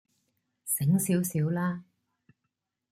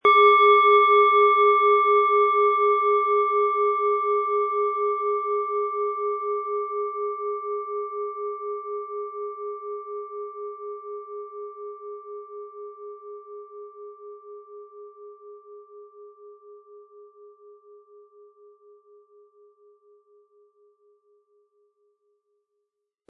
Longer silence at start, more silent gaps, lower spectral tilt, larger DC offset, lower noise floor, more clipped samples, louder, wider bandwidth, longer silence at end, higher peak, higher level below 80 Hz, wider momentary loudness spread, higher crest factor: first, 0.65 s vs 0.05 s; neither; first, -6 dB/octave vs -4.5 dB/octave; neither; about the same, -83 dBFS vs -81 dBFS; neither; second, -28 LUFS vs -21 LUFS; first, 16 kHz vs 5 kHz; second, 1.1 s vs 6.05 s; second, -16 dBFS vs -6 dBFS; first, -68 dBFS vs -88 dBFS; second, 13 LU vs 25 LU; about the same, 16 dB vs 18 dB